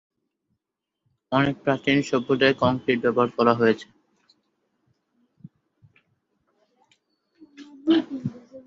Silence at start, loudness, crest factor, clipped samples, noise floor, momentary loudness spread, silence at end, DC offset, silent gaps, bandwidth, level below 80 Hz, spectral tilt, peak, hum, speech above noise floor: 1.3 s; -22 LUFS; 22 dB; under 0.1%; -83 dBFS; 11 LU; 0.05 s; under 0.1%; none; 7.8 kHz; -62 dBFS; -6.5 dB/octave; -4 dBFS; none; 61 dB